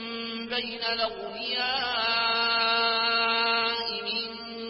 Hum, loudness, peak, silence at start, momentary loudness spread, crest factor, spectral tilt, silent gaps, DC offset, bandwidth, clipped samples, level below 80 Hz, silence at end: none; -26 LUFS; -12 dBFS; 0 s; 8 LU; 16 dB; -6 dB/octave; none; under 0.1%; 5.8 kHz; under 0.1%; -62 dBFS; 0 s